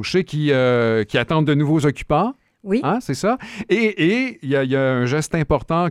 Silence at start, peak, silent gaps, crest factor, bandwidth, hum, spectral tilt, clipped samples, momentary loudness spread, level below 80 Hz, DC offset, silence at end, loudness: 0 s; -4 dBFS; none; 14 dB; 13.5 kHz; none; -6.5 dB/octave; under 0.1%; 5 LU; -42 dBFS; under 0.1%; 0 s; -19 LUFS